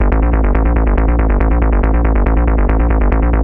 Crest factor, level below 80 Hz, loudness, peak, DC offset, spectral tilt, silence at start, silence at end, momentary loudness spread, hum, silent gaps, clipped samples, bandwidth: 10 dB; -12 dBFS; -14 LUFS; 0 dBFS; 0.4%; -12 dB/octave; 0 s; 0 s; 0 LU; none; none; under 0.1%; 3.1 kHz